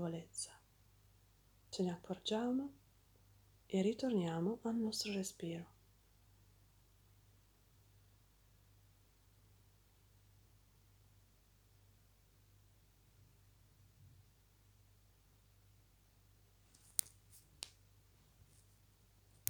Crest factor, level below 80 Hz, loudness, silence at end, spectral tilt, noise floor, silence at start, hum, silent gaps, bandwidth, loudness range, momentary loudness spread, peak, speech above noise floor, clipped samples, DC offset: 38 dB; -74 dBFS; -41 LUFS; 1.8 s; -4.5 dB/octave; -70 dBFS; 0 s; none; none; over 20 kHz; 9 LU; 20 LU; -8 dBFS; 30 dB; under 0.1%; under 0.1%